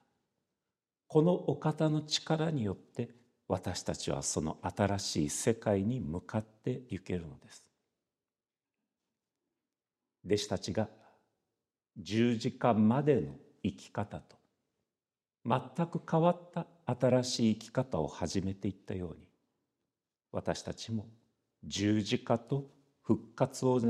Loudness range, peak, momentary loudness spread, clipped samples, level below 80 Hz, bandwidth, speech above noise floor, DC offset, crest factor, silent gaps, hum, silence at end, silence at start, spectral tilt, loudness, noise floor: 9 LU; -12 dBFS; 12 LU; under 0.1%; -62 dBFS; 13.5 kHz; over 57 dB; under 0.1%; 22 dB; none; none; 0 s; 1.1 s; -5.5 dB/octave; -34 LUFS; under -90 dBFS